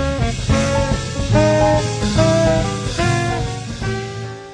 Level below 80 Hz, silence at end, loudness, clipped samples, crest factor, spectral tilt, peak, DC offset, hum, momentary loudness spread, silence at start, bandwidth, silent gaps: -28 dBFS; 0 s; -18 LUFS; under 0.1%; 16 dB; -5.5 dB/octave; -2 dBFS; under 0.1%; none; 10 LU; 0 s; 10.5 kHz; none